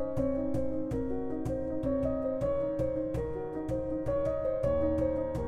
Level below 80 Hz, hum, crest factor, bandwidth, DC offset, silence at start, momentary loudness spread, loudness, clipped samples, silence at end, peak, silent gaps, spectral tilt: -44 dBFS; none; 14 dB; 10.5 kHz; under 0.1%; 0 s; 5 LU; -32 LUFS; under 0.1%; 0 s; -18 dBFS; none; -9.5 dB/octave